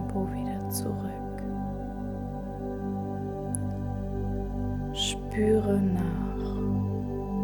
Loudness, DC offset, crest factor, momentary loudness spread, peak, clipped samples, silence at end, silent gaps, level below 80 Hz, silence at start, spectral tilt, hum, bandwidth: -31 LUFS; under 0.1%; 20 dB; 10 LU; -10 dBFS; under 0.1%; 0 s; none; -40 dBFS; 0 s; -6 dB/octave; 50 Hz at -45 dBFS; 19 kHz